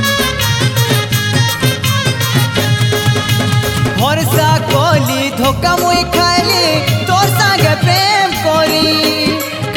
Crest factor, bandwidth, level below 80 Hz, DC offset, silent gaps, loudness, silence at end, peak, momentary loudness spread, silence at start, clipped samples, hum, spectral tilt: 12 dB; 17.5 kHz; -34 dBFS; under 0.1%; none; -12 LUFS; 0 s; 0 dBFS; 3 LU; 0 s; under 0.1%; none; -4 dB/octave